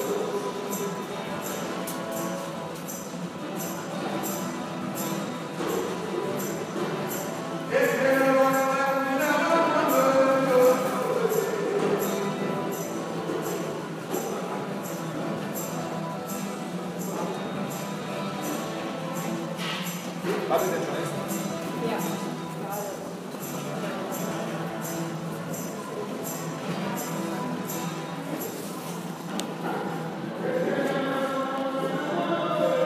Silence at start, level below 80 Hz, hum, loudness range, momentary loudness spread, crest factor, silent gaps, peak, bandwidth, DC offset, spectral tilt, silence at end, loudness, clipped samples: 0 s; -72 dBFS; none; 9 LU; 11 LU; 20 dB; none; -8 dBFS; 15.5 kHz; under 0.1%; -4.5 dB/octave; 0 s; -28 LUFS; under 0.1%